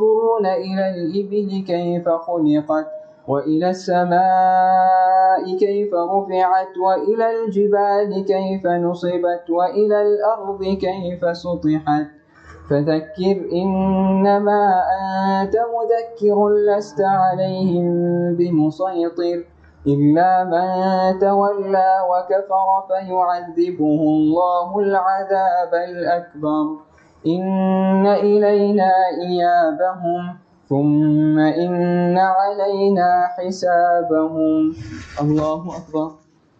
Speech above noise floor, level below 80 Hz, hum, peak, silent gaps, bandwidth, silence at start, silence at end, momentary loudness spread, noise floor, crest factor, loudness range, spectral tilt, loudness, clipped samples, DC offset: 26 dB; -54 dBFS; none; -6 dBFS; none; 7.6 kHz; 0 s; 0.45 s; 7 LU; -43 dBFS; 12 dB; 3 LU; -8 dB/octave; -18 LUFS; under 0.1%; under 0.1%